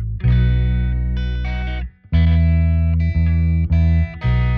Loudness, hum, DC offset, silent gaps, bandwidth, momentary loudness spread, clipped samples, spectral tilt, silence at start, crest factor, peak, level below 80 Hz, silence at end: -18 LUFS; none; under 0.1%; none; 4.9 kHz; 8 LU; under 0.1%; -10 dB/octave; 0 s; 10 dB; -6 dBFS; -20 dBFS; 0 s